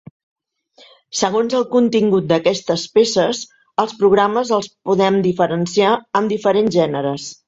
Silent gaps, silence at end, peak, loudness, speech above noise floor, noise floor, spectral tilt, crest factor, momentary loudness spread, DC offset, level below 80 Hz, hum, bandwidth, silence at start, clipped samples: none; 0.15 s; -2 dBFS; -17 LUFS; 35 dB; -51 dBFS; -5 dB/octave; 16 dB; 6 LU; under 0.1%; -58 dBFS; none; 8 kHz; 1.15 s; under 0.1%